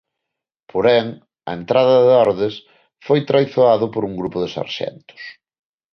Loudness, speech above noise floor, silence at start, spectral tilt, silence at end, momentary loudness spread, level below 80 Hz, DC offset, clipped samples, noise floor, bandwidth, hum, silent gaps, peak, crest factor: -17 LUFS; 65 dB; 0.75 s; -7 dB/octave; 0.6 s; 23 LU; -56 dBFS; under 0.1%; under 0.1%; -82 dBFS; 6.4 kHz; none; none; -2 dBFS; 16 dB